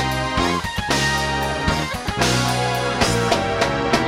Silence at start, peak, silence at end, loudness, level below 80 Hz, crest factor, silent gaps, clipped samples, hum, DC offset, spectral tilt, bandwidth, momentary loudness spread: 0 s; -2 dBFS; 0 s; -20 LUFS; -34 dBFS; 18 dB; none; under 0.1%; none; under 0.1%; -4 dB/octave; 16.5 kHz; 3 LU